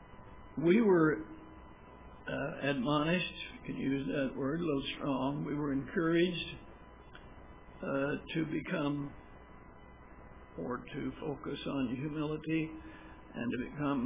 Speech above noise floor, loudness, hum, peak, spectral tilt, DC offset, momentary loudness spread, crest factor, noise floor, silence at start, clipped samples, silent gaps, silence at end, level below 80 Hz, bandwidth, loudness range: 20 dB; -35 LUFS; none; -16 dBFS; -5 dB/octave; under 0.1%; 24 LU; 20 dB; -54 dBFS; 0 s; under 0.1%; none; 0 s; -58 dBFS; 3.8 kHz; 7 LU